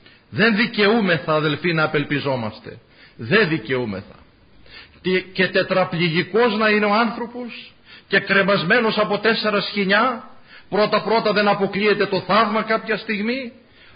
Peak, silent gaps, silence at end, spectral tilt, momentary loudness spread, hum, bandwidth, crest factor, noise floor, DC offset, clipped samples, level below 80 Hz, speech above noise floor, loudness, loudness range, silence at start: -4 dBFS; none; 0.45 s; -10.5 dB/octave; 12 LU; none; 5.2 kHz; 16 dB; -49 dBFS; under 0.1%; under 0.1%; -58 dBFS; 29 dB; -19 LUFS; 4 LU; 0.3 s